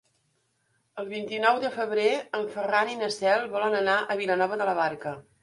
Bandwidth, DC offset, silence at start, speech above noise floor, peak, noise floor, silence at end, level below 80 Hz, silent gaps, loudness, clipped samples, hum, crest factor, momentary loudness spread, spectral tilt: 11.5 kHz; under 0.1%; 0.95 s; 46 dB; -8 dBFS; -72 dBFS; 0.2 s; -74 dBFS; none; -26 LUFS; under 0.1%; none; 20 dB; 11 LU; -4 dB/octave